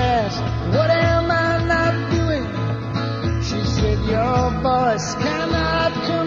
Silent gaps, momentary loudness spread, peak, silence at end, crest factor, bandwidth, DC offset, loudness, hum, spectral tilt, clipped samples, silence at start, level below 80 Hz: none; 6 LU; -6 dBFS; 0 s; 14 dB; 7.6 kHz; under 0.1%; -20 LUFS; none; -6 dB/octave; under 0.1%; 0 s; -32 dBFS